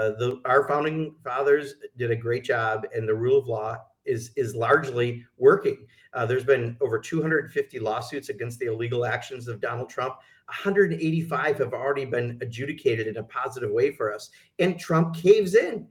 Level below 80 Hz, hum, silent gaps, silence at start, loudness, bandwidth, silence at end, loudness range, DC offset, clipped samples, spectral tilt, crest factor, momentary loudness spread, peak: -68 dBFS; none; none; 0 s; -25 LUFS; 15 kHz; 0.05 s; 4 LU; under 0.1%; under 0.1%; -6.5 dB/octave; 18 dB; 11 LU; -6 dBFS